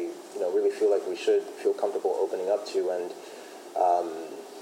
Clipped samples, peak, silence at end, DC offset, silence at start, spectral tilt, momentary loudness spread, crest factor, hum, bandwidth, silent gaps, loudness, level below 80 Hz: under 0.1%; -12 dBFS; 0 s; under 0.1%; 0 s; -3.5 dB/octave; 13 LU; 16 dB; none; 16 kHz; none; -28 LUFS; under -90 dBFS